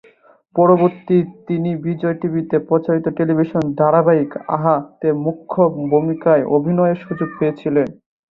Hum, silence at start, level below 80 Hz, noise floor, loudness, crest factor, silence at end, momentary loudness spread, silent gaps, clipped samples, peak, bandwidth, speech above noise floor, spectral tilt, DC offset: none; 0.55 s; -58 dBFS; -51 dBFS; -17 LUFS; 16 dB; 0.35 s; 8 LU; none; under 0.1%; -2 dBFS; 4.7 kHz; 35 dB; -11 dB/octave; under 0.1%